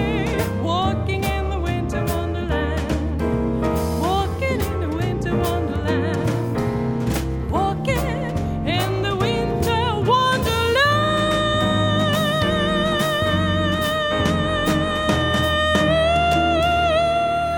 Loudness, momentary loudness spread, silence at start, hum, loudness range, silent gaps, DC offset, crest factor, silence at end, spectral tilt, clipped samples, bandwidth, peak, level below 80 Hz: -20 LUFS; 6 LU; 0 s; none; 4 LU; none; 0.1%; 16 dB; 0 s; -5.5 dB/octave; under 0.1%; 19 kHz; -4 dBFS; -32 dBFS